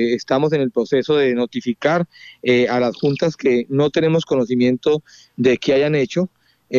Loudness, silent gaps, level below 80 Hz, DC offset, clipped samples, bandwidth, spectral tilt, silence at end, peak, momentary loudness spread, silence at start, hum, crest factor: -18 LUFS; none; -58 dBFS; under 0.1%; under 0.1%; 7.4 kHz; -6.5 dB/octave; 0 s; -4 dBFS; 5 LU; 0 s; none; 14 dB